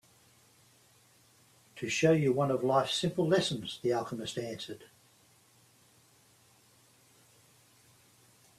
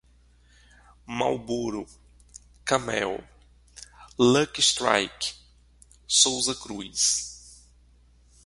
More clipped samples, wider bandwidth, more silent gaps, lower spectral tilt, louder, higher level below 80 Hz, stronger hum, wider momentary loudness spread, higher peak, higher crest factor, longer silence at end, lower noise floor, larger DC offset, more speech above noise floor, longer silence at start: neither; first, 14.5 kHz vs 11.5 kHz; neither; first, -5 dB/octave vs -2 dB/octave; second, -31 LUFS vs -24 LUFS; second, -72 dBFS vs -56 dBFS; second, none vs 60 Hz at -50 dBFS; second, 15 LU vs 21 LU; second, -14 dBFS vs -4 dBFS; second, 20 dB vs 26 dB; first, 3.75 s vs 0.9 s; first, -64 dBFS vs -58 dBFS; neither; about the same, 34 dB vs 33 dB; first, 1.75 s vs 1.1 s